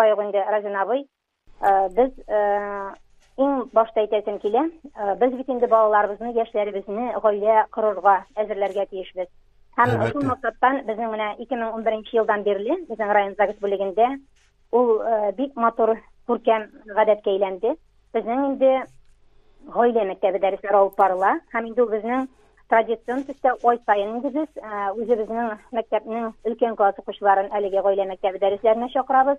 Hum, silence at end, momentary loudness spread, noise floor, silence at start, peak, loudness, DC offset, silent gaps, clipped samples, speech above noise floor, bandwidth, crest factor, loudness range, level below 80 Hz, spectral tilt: none; 0 s; 9 LU; -53 dBFS; 0 s; -4 dBFS; -22 LUFS; under 0.1%; none; under 0.1%; 31 dB; 8.4 kHz; 18 dB; 2 LU; -56 dBFS; -7.5 dB/octave